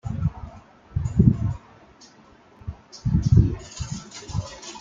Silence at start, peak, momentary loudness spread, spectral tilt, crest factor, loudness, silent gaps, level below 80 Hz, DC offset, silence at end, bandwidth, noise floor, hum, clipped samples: 0.05 s; -2 dBFS; 21 LU; -7.5 dB/octave; 22 dB; -24 LUFS; none; -34 dBFS; under 0.1%; 0 s; 7.6 kHz; -52 dBFS; none; under 0.1%